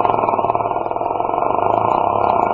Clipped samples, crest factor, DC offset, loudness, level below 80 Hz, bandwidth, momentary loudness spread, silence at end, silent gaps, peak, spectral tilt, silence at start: under 0.1%; 16 dB; under 0.1%; -18 LUFS; -48 dBFS; 7.2 kHz; 4 LU; 0 s; none; 0 dBFS; -8.5 dB/octave; 0 s